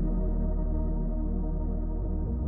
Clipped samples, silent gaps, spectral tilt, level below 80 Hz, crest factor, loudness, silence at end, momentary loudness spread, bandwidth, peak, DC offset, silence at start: under 0.1%; none; -14 dB/octave; -28 dBFS; 10 dB; -32 LUFS; 0 s; 2 LU; 1.9 kHz; -18 dBFS; under 0.1%; 0 s